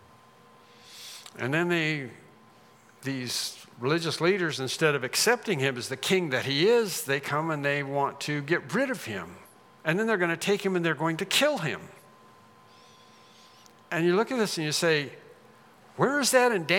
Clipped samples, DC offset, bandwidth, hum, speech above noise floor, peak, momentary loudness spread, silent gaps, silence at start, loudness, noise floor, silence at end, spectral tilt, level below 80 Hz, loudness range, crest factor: under 0.1%; under 0.1%; 18 kHz; none; 30 dB; -8 dBFS; 12 LU; none; 0.85 s; -27 LUFS; -56 dBFS; 0 s; -4 dB/octave; -80 dBFS; 5 LU; 22 dB